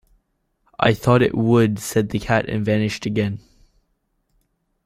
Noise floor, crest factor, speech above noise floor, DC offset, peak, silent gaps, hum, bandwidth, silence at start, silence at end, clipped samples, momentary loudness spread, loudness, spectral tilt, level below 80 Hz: -69 dBFS; 18 dB; 51 dB; under 0.1%; -2 dBFS; none; none; 15.5 kHz; 0.8 s; 1.45 s; under 0.1%; 6 LU; -19 LUFS; -6.5 dB/octave; -46 dBFS